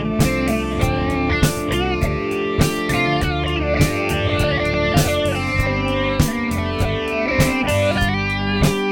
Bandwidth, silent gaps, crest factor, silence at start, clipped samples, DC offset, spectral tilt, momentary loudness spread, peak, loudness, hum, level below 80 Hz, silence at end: 17.5 kHz; none; 16 dB; 0 s; under 0.1%; under 0.1%; -5.5 dB/octave; 3 LU; -2 dBFS; -19 LUFS; none; -28 dBFS; 0 s